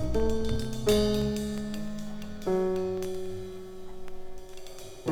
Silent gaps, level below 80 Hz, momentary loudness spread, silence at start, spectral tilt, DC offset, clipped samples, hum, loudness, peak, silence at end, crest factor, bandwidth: none; -40 dBFS; 20 LU; 0 s; -6 dB/octave; under 0.1%; under 0.1%; none; -30 LUFS; -12 dBFS; 0 s; 18 dB; 18.5 kHz